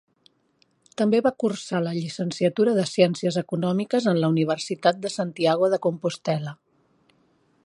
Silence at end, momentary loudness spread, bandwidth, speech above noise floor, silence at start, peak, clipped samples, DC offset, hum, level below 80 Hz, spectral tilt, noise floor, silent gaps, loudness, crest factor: 1.1 s; 7 LU; 11.5 kHz; 43 dB; 1 s; -4 dBFS; under 0.1%; under 0.1%; none; -70 dBFS; -6 dB/octave; -66 dBFS; none; -24 LUFS; 20 dB